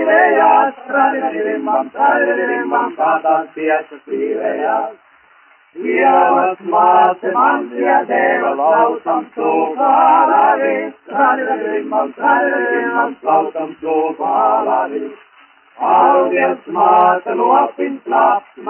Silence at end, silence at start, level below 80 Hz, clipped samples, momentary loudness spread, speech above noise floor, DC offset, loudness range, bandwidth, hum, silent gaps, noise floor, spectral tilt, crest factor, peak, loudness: 0 s; 0 s; -72 dBFS; under 0.1%; 9 LU; 35 dB; under 0.1%; 4 LU; 3.2 kHz; none; none; -49 dBFS; -8.5 dB/octave; 14 dB; 0 dBFS; -14 LUFS